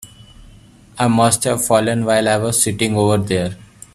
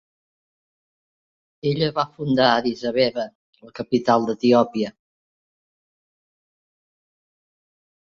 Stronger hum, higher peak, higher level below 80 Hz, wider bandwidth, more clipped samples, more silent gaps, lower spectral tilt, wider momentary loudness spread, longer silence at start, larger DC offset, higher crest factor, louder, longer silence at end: neither; about the same, 0 dBFS vs -2 dBFS; first, -46 dBFS vs -62 dBFS; first, 15 kHz vs 7.2 kHz; neither; second, none vs 3.35-3.53 s; second, -4.5 dB/octave vs -6.5 dB/octave; second, 6 LU vs 12 LU; second, 0 s vs 1.65 s; neither; about the same, 18 dB vs 22 dB; first, -16 LUFS vs -21 LUFS; second, 0.35 s vs 3.2 s